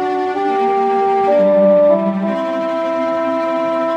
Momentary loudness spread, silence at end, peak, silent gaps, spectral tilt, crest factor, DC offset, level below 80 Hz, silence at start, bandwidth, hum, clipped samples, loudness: 8 LU; 0 s; -2 dBFS; none; -7.5 dB/octave; 12 dB; under 0.1%; -68 dBFS; 0 s; 8 kHz; none; under 0.1%; -15 LUFS